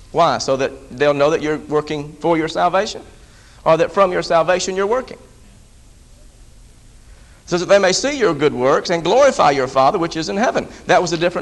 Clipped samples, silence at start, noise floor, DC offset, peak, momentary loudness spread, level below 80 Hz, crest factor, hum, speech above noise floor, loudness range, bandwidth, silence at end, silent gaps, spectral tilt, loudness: under 0.1%; 0 s; -45 dBFS; under 0.1%; 0 dBFS; 9 LU; -46 dBFS; 18 dB; none; 28 dB; 6 LU; 11.5 kHz; 0 s; none; -4 dB/octave; -17 LUFS